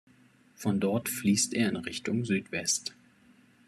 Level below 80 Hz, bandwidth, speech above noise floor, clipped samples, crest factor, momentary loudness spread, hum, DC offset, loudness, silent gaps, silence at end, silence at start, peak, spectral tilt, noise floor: -70 dBFS; 14 kHz; 32 dB; under 0.1%; 18 dB; 7 LU; none; under 0.1%; -29 LUFS; none; 0.75 s; 0.6 s; -14 dBFS; -4 dB/octave; -61 dBFS